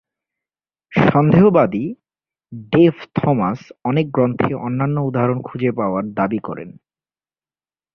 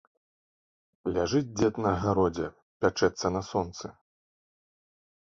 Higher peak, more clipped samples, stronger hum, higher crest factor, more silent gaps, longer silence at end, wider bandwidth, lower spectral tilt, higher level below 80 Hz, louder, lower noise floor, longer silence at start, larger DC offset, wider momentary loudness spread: first, -2 dBFS vs -10 dBFS; neither; neither; about the same, 16 dB vs 20 dB; second, none vs 2.62-2.80 s; second, 1.25 s vs 1.4 s; second, 6.2 kHz vs 7.6 kHz; first, -10 dB/octave vs -5.5 dB/octave; about the same, -52 dBFS vs -52 dBFS; first, -17 LUFS vs -29 LUFS; about the same, under -90 dBFS vs under -90 dBFS; second, 0.9 s vs 1.05 s; neither; first, 14 LU vs 11 LU